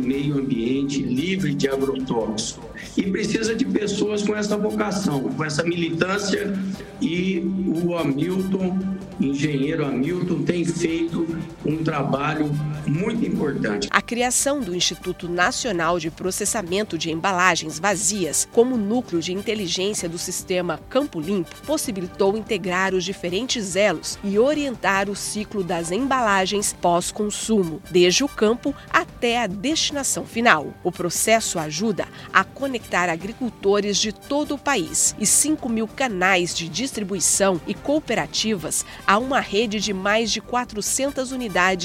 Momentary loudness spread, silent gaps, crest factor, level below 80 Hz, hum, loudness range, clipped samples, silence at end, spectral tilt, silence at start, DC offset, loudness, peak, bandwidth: 7 LU; none; 22 dB; -50 dBFS; none; 3 LU; under 0.1%; 0 s; -3.5 dB/octave; 0 s; under 0.1%; -22 LUFS; 0 dBFS; 16.5 kHz